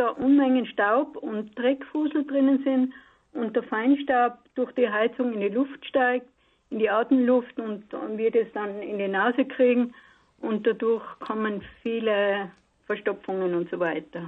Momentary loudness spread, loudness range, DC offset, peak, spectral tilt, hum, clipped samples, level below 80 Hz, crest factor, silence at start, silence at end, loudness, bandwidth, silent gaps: 11 LU; 3 LU; under 0.1%; -12 dBFS; -8.5 dB/octave; none; under 0.1%; -68 dBFS; 14 dB; 0 s; 0 s; -25 LUFS; 4.1 kHz; none